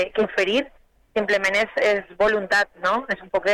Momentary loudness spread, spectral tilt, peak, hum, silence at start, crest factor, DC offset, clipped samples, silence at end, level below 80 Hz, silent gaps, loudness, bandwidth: 6 LU; -3.5 dB/octave; -12 dBFS; none; 0 s; 10 dB; under 0.1%; under 0.1%; 0 s; -54 dBFS; none; -22 LUFS; 15 kHz